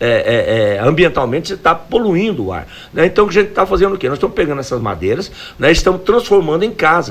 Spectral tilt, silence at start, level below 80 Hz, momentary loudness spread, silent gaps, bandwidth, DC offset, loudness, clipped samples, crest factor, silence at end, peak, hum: -5.5 dB/octave; 0 s; -32 dBFS; 8 LU; none; 15.5 kHz; under 0.1%; -14 LUFS; under 0.1%; 14 dB; 0 s; 0 dBFS; none